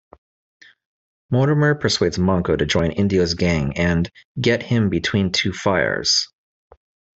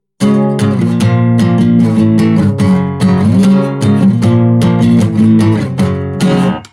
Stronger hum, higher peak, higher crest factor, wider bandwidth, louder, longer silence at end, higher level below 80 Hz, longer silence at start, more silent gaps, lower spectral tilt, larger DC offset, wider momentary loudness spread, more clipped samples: neither; second, -4 dBFS vs 0 dBFS; first, 16 dB vs 10 dB; second, 8.2 kHz vs 12 kHz; second, -19 LUFS vs -10 LUFS; first, 0.9 s vs 0.05 s; about the same, -44 dBFS vs -42 dBFS; first, 1.3 s vs 0.2 s; first, 4.25-4.35 s vs none; second, -5 dB/octave vs -8 dB/octave; neither; about the same, 3 LU vs 4 LU; neither